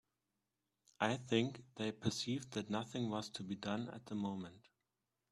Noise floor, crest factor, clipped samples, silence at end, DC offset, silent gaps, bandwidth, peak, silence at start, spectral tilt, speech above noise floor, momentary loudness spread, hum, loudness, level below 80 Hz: -89 dBFS; 24 dB; under 0.1%; 0.75 s; under 0.1%; none; 13 kHz; -18 dBFS; 1 s; -5 dB/octave; 48 dB; 8 LU; none; -41 LUFS; -74 dBFS